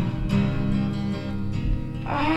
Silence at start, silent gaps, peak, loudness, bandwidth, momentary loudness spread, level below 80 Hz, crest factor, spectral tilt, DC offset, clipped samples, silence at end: 0 s; none; -10 dBFS; -26 LUFS; 11 kHz; 6 LU; -32 dBFS; 14 dB; -8 dB/octave; under 0.1%; under 0.1%; 0 s